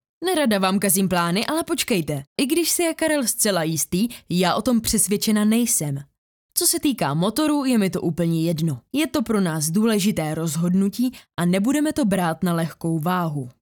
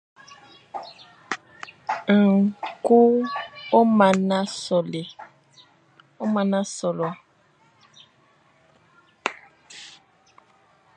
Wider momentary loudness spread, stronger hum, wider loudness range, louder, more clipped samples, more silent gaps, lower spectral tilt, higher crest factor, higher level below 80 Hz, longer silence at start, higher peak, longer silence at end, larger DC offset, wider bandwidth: second, 6 LU vs 24 LU; neither; second, 2 LU vs 19 LU; about the same, -21 LUFS vs -22 LUFS; neither; first, 2.27-2.36 s, 6.18-6.49 s vs none; second, -4.5 dB/octave vs -6 dB/octave; about the same, 18 dB vs 22 dB; first, -52 dBFS vs -72 dBFS; second, 0.2 s vs 0.75 s; about the same, -4 dBFS vs -2 dBFS; second, 0.1 s vs 1.1 s; neither; first, over 20 kHz vs 9.6 kHz